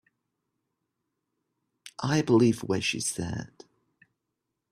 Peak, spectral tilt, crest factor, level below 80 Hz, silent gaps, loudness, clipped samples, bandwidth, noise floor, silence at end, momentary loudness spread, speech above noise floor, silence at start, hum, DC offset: -10 dBFS; -5 dB/octave; 20 dB; -62 dBFS; none; -26 LUFS; under 0.1%; 14.5 kHz; -84 dBFS; 1.25 s; 17 LU; 57 dB; 1.85 s; none; under 0.1%